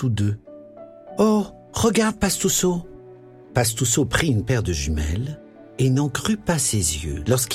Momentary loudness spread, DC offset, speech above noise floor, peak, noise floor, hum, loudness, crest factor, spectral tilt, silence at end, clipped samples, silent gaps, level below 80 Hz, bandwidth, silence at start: 12 LU; under 0.1%; 23 dB; -4 dBFS; -44 dBFS; none; -21 LUFS; 18 dB; -4.5 dB/octave; 0 s; under 0.1%; none; -36 dBFS; 16.5 kHz; 0 s